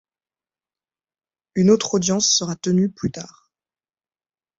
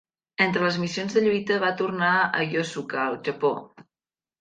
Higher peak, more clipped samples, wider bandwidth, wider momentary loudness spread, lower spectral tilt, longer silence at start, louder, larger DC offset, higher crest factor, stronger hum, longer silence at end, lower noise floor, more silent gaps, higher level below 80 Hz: about the same, -4 dBFS vs -6 dBFS; neither; second, 8 kHz vs 9.2 kHz; first, 13 LU vs 6 LU; about the same, -4.5 dB/octave vs -5 dB/octave; first, 1.55 s vs 0.4 s; first, -19 LUFS vs -24 LUFS; neither; about the same, 20 dB vs 20 dB; neither; first, 1.3 s vs 0.6 s; about the same, under -90 dBFS vs under -90 dBFS; neither; first, -58 dBFS vs -68 dBFS